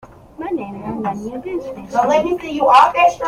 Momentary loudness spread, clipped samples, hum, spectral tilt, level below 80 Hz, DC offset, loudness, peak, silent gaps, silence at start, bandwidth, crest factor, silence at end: 16 LU; under 0.1%; none; -5 dB/octave; -48 dBFS; under 0.1%; -17 LUFS; 0 dBFS; none; 0.05 s; 16 kHz; 16 dB; 0 s